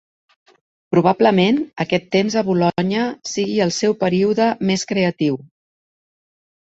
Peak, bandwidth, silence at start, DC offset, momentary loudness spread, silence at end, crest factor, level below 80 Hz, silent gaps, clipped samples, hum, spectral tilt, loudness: -2 dBFS; 8 kHz; 0.9 s; under 0.1%; 7 LU; 1.2 s; 18 dB; -58 dBFS; none; under 0.1%; none; -5.5 dB/octave; -18 LUFS